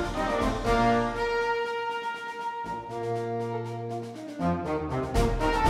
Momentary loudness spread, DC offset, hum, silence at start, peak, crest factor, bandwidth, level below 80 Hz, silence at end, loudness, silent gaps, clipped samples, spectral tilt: 10 LU; under 0.1%; none; 0 s; -10 dBFS; 18 dB; 15 kHz; -38 dBFS; 0 s; -29 LUFS; none; under 0.1%; -6 dB/octave